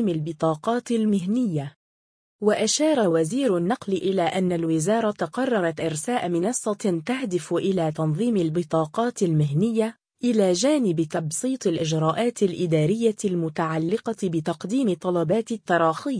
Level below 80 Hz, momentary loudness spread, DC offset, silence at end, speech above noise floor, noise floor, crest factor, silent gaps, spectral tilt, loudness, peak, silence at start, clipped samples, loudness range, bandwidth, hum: -64 dBFS; 5 LU; under 0.1%; 0 s; over 67 dB; under -90 dBFS; 16 dB; 1.76-2.39 s; -5.5 dB/octave; -24 LUFS; -8 dBFS; 0 s; under 0.1%; 2 LU; 10.5 kHz; none